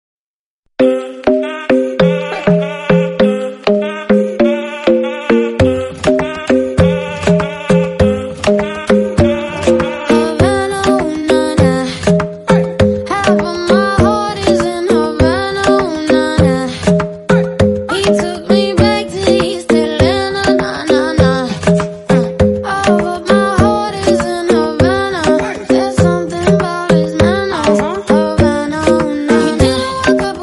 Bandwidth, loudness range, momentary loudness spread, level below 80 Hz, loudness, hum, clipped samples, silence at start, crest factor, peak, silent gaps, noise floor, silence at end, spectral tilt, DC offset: 11.5 kHz; 1 LU; 3 LU; -32 dBFS; -13 LUFS; none; under 0.1%; 0.8 s; 12 dB; 0 dBFS; none; under -90 dBFS; 0 s; -6 dB/octave; under 0.1%